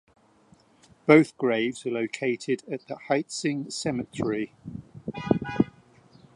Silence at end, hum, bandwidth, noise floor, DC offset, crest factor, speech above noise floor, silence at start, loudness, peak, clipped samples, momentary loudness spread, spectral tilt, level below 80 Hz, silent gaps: 0.65 s; none; 11.5 kHz; -59 dBFS; under 0.1%; 26 dB; 33 dB; 1.05 s; -26 LUFS; -2 dBFS; under 0.1%; 17 LU; -5.5 dB/octave; -60 dBFS; none